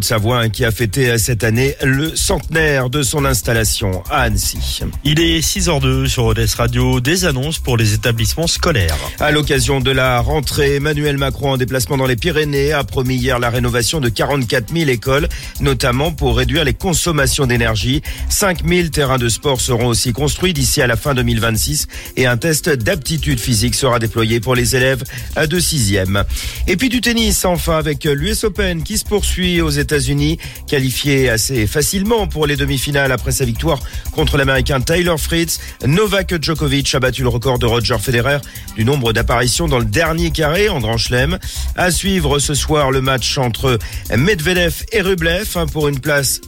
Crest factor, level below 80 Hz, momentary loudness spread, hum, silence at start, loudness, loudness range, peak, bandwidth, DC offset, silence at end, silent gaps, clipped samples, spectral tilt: 12 dB; -26 dBFS; 4 LU; none; 0 s; -15 LUFS; 1 LU; -2 dBFS; 17 kHz; under 0.1%; 0 s; none; under 0.1%; -4 dB/octave